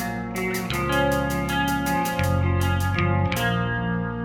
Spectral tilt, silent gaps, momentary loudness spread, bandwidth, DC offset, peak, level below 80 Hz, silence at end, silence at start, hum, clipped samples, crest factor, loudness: -5.5 dB/octave; none; 4 LU; 20 kHz; under 0.1%; -8 dBFS; -38 dBFS; 0 s; 0 s; none; under 0.1%; 16 dB; -23 LUFS